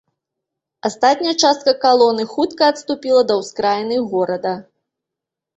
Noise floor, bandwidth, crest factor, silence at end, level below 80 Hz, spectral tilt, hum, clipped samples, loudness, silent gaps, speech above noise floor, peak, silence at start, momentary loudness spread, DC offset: -84 dBFS; 8.2 kHz; 18 dB; 0.95 s; -64 dBFS; -3.5 dB/octave; none; under 0.1%; -17 LUFS; none; 68 dB; 0 dBFS; 0.85 s; 10 LU; under 0.1%